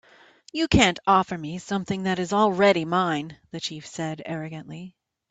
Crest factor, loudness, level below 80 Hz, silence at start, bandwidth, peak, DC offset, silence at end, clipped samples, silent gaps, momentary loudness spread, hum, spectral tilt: 22 dB; -24 LUFS; -48 dBFS; 0.55 s; 9.2 kHz; -4 dBFS; under 0.1%; 0.4 s; under 0.1%; none; 16 LU; none; -5 dB/octave